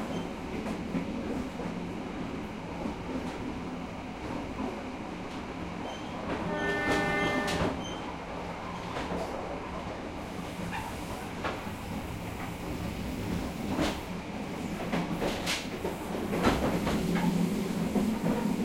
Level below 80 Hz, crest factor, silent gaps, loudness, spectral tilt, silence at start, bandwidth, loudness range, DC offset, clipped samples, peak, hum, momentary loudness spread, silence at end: -48 dBFS; 20 dB; none; -33 LUFS; -5.5 dB/octave; 0 s; 16.5 kHz; 7 LU; under 0.1%; under 0.1%; -12 dBFS; none; 10 LU; 0 s